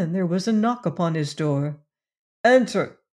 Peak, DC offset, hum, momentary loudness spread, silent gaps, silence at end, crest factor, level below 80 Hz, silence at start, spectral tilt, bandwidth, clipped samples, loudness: -6 dBFS; under 0.1%; none; 9 LU; 2.19-2.44 s; 0.25 s; 18 dB; -72 dBFS; 0 s; -6.5 dB/octave; 11.5 kHz; under 0.1%; -22 LUFS